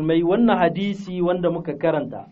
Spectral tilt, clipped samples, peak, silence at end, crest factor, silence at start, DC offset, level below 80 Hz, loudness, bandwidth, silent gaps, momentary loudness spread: -6 dB/octave; under 0.1%; -4 dBFS; 0.05 s; 18 dB; 0 s; under 0.1%; -52 dBFS; -21 LUFS; 7.4 kHz; none; 9 LU